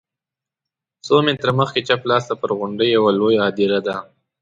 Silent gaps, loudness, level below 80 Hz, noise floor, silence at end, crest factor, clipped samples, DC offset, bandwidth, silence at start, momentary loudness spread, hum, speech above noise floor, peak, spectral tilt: none; -18 LUFS; -58 dBFS; -87 dBFS; 0.4 s; 18 dB; under 0.1%; under 0.1%; 7.8 kHz; 1.05 s; 7 LU; none; 70 dB; -2 dBFS; -6 dB/octave